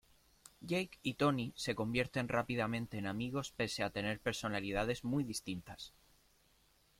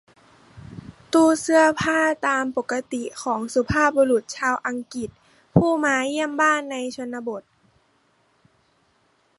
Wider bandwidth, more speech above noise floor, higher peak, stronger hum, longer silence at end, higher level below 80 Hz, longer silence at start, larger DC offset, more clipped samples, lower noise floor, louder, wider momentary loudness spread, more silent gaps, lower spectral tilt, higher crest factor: first, 16.5 kHz vs 11.5 kHz; second, 33 dB vs 43 dB; second, -18 dBFS vs -2 dBFS; neither; second, 1.1 s vs 2 s; second, -62 dBFS vs -50 dBFS; about the same, 0.6 s vs 0.55 s; neither; neither; first, -71 dBFS vs -64 dBFS; second, -38 LUFS vs -22 LUFS; second, 9 LU vs 15 LU; neither; about the same, -5 dB/octave vs -5 dB/octave; about the same, 20 dB vs 22 dB